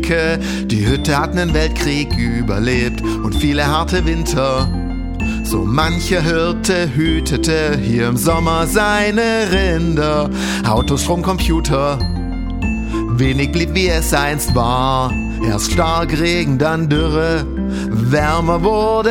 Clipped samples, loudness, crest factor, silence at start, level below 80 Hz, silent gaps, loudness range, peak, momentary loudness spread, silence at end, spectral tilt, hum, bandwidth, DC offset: under 0.1%; -16 LUFS; 16 dB; 0 s; -24 dBFS; none; 2 LU; 0 dBFS; 5 LU; 0 s; -5 dB/octave; none; 18 kHz; under 0.1%